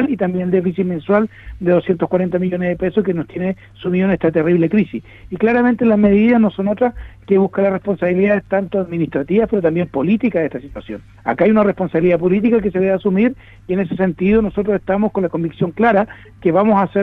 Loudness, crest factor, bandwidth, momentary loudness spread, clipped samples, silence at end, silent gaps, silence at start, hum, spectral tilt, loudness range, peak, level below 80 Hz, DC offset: -16 LUFS; 14 dB; 4.1 kHz; 9 LU; under 0.1%; 0 s; none; 0 s; none; -10.5 dB/octave; 3 LU; -2 dBFS; -42 dBFS; under 0.1%